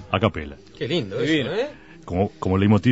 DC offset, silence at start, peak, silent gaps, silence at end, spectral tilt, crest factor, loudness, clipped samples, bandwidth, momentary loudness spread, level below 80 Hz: 0.2%; 0 s; -2 dBFS; none; 0 s; -7 dB/octave; 20 dB; -23 LUFS; under 0.1%; 8 kHz; 14 LU; -46 dBFS